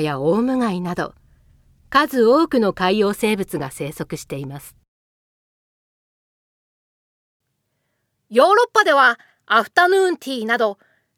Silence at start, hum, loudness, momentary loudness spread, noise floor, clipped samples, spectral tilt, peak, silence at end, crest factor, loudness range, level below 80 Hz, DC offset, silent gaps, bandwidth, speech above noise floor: 0 s; none; -18 LUFS; 15 LU; -73 dBFS; under 0.1%; -5 dB/octave; 0 dBFS; 0.45 s; 20 dB; 17 LU; -56 dBFS; under 0.1%; 4.88-7.40 s; 17.5 kHz; 55 dB